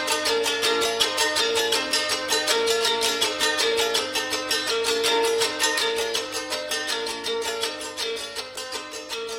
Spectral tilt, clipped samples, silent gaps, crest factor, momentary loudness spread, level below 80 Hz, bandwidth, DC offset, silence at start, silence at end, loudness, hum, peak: 0 dB/octave; under 0.1%; none; 20 dB; 8 LU; -60 dBFS; 16.5 kHz; under 0.1%; 0 s; 0 s; -23 LUFS; none; -6 dBFS